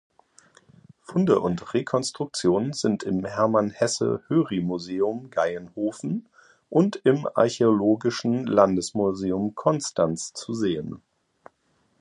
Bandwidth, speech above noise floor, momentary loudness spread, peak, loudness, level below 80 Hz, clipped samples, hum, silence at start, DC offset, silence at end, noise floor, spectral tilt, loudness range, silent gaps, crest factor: 11.5 kHz; 44 dB; 9 LU; -4 dBFS; -24 LUFS; -60 dBFS; under 0.1%; none; 1.1 s; under 0.1%; 1.05 s; -68 dBFS; -5.5 dB/octave; 3 LU; none; 22 dB